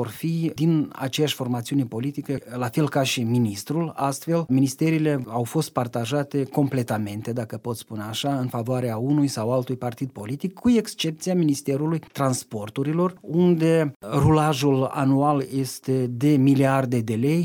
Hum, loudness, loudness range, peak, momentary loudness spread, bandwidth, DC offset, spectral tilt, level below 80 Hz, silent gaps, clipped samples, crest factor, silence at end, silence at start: none; -23 LUFS; 5 LU; -6 dBFS; 10 LU; 19.5 kHz; under 0.1%; -6.5 dB/octave; -54 dBFS; 13.96-14.00 s; under 0.1%; 16 dB; 0 s; 0 s